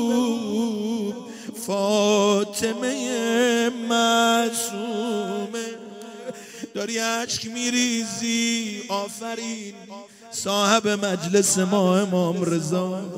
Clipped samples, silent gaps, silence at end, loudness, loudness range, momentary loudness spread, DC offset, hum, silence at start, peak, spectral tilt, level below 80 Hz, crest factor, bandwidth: under 0.1%; none; 0 s; -23 LUFS; 5 LU; 16 LU; under 0.1%; none; 0 s; -4 dBFS; -3.5 dB/octave; -68 dBFS; 20 dB; 16 kHz